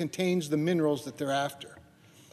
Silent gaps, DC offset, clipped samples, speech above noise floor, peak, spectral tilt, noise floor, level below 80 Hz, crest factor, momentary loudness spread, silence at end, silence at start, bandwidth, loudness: none; under 0.1%; under 0.1%; 27 dB; -16 dBFS; -5.5 dB/octave; -57 dBFS; -74 dBFS; 16 dB; 13 LU; 0.55 s; 0 s; 14 kHz; -30 LUFS